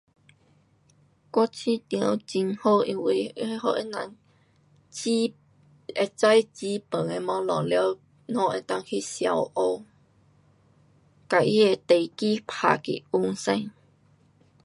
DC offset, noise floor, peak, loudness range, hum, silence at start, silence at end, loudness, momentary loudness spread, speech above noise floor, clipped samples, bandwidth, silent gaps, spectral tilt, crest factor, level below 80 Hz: under 0.1%; -62 dBFS; -4 dBFS; 4 LU; none; 1.35 s; 0.95 s; -26 LUFS; 11 LU; 38 dB; under 0.1%; 11.5 kHz; none; -5 dB/octave; 24 dB; -72 dBFS